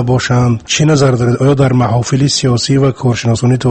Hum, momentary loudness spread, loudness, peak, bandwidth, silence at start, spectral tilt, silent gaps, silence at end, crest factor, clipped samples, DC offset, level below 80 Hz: none; 3 LU; -11 LUFS; 0 dBFS; 8.8 kHz; 0 s; -5.5 dB/octave; none; 0 s; 10 dB; under 0.1%; under 0.1%; -38 dBFS